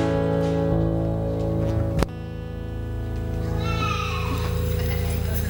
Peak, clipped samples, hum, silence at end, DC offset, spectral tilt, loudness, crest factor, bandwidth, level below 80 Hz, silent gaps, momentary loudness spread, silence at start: -6 dBFS; under 0.1%; none; 0 s; under 0.1%; -7 dB/octave; -25 LUFS; 18 dB; 17 kHz; -32 dBFS; none; 9 LU; 0 s